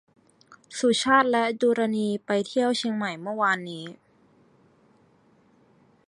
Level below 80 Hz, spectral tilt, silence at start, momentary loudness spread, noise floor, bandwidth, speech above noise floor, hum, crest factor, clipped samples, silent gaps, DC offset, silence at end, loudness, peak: -72 dBFS; -4 dB/octave; 0.5 s; 15 LU; -61 dBFS; 11 kHz; 36 dB; none; 22 dB; under 0.1%; none; under 0.1%; 2.15 s; -24 LUFS; -6 dBFS